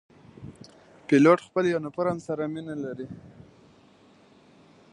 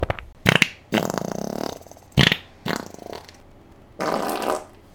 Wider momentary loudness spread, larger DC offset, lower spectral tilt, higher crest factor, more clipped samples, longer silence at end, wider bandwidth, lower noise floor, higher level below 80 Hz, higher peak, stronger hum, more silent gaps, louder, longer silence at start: first, 26 LU vs 19 LU; neither; first, -7 dB/octave vs -4.5 dB/octave; about the same, 22 dB vs 26 dB; neither; first, 1.65 s vs 0.25 s; second, 10 kHz vs 19 kHz; first, -57 dBFS vs -48 dBFS; second, -66 dBFS vs -44 dBFS; second, -6 dBFS vs 0 dBFS; neither; neither; about the same, -25 LUFS vs -23 LUFS; first, 0.4 s vs 0 s